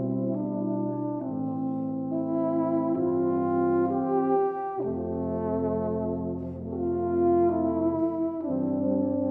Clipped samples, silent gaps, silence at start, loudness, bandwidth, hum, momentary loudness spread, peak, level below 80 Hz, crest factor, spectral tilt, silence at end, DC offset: under 0.1%; none; 0 s; -27 LUFS; 2.7 kHz; none; 7 LU; -12 dBFS; -56 dBFS; 14 dB; -13 dB/octave; 0 s; under 0.1%